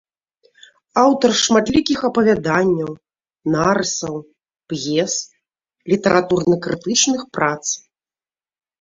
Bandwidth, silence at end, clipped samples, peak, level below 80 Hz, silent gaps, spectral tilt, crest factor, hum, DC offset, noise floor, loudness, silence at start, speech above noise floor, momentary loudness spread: 7.8 kHz; 1 s; under 0.1%; -2 dBFS; -50 dBFS; none; -3.5 dB/octave; 18 dB; none; under 0.1%; under -90 dBFS; -18 LUFS; 0.95 s; over 73 dB; 13 LU